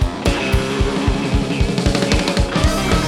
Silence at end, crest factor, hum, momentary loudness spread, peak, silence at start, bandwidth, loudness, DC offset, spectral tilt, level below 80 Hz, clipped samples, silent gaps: 0 s; 14 dB; none; 3 LU; -2 dBFS; 0 s; 15.5 kHz; -18 LUFS; under 0.1%; -5 dB/octave; -22 dBFS; under 0.1%; none